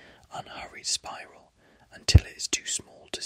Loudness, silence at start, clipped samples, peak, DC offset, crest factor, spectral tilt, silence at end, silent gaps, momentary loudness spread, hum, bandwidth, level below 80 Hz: -26 LUFS; 0.35 s; under 0.1%; -4 dBFS; under 0.1%; 26 dB; -3.5 dB/octave; 0 s; none; 20 LU; none; 15.5 kHz; -36 dBFS